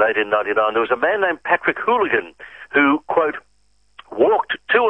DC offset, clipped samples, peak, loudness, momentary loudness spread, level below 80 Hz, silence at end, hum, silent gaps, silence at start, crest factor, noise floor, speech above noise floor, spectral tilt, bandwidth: 0.1%; under 0.1%; 0 dBFS; -18 LUFS; 7 LU; -60 dBFS; 0 s; 50 Hz at -65 dBFS; none; 0 s; 18 dB; -63 dBFS; 45 dB; -6.5 dB/octave; 5.6 kHz